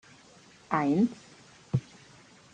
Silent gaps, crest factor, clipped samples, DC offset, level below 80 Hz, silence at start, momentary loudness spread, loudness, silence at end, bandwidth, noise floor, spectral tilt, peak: none; 22 dB; under 0.1%; under 0.1%; -66 dBFS; 0.7 s; 8 LU; -29 LUFS; 0.75 s; 9.6 kHz; -56 dBFS; -7.5 dB/octave; -10 dBFS